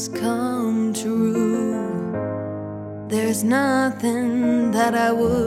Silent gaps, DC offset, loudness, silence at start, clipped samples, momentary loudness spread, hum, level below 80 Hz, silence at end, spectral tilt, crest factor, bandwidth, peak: none; under 0.1%; -21 LUFS; 0 s; under 0.1%; 9 LU; none; -52 dBFS; 0 s; -5.5 dB/octave; 14 dB; 15.5 kHz; -6 dBFS